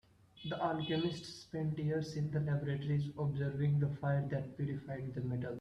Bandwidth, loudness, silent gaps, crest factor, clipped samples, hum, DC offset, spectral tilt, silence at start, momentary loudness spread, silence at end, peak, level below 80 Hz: 8.2 kHz; -38 LUFS; none; 16 dB; under 0.1%; none; under 0.1%; -7.5 dB/octave; 0.35 s; 8 LU; 0 s; -22 dBFS; -66 dBFS